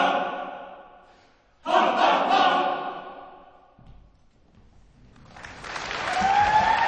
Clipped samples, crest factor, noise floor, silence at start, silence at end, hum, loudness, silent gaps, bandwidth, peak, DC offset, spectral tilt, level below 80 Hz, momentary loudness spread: under 0.1%; 20 dB; -58 dBFS; 0 s; 0 s; none; -23 LUFS; none; 9.8 kHz; -6 dBFS; under 0.1%; -3.5 dB/octave; -54 dBFS; 22 LU